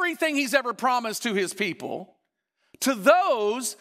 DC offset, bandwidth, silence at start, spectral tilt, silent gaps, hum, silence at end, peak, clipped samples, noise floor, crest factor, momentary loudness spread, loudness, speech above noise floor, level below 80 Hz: under 0.1%; 16 kHz; 0 s; -3 dB/octave; none; none; 0.05 s; -6 dBFS; under 0.1%; -76 dBFS; 20 dB; 10 LU; -24 LUFS; 51 dB; -84 dBFS